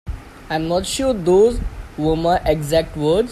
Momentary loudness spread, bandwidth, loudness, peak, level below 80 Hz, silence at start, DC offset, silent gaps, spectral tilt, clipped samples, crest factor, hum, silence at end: 14 LU; 14 kHz; -18 LUFS; -4 dBFS; -32 dBFS; 0.05 s; under 0.1%; none; -5.5 dB/octave; under 0.1%; 14 dB; none; 0 s